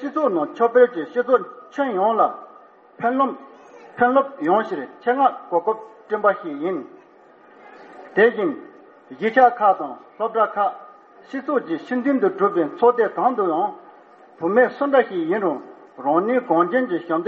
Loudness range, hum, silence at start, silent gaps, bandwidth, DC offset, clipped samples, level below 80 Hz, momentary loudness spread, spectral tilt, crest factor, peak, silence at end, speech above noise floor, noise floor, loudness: 3 LU; none; 0 s; none; 6.2 kHz; under 0.1%; under 0.1%; -70 dBFS; 11 LU; -4 dB/octave; 18 dB; -2 dBFS; 0 s; 30 dB; -50 dBFS; -20 LUFS